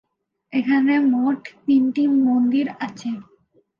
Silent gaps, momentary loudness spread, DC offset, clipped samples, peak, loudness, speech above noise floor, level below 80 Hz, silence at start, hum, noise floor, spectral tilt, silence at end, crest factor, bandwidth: none; 12 LU; under 0.1%; under 0.1%; -8 dBFS; -20 LUFS; 29 dB; -74 dBFS; 0.55 s; none; -48 dBFS; -6 dB/octave; 0.6 s; 12 dB; 7 kHz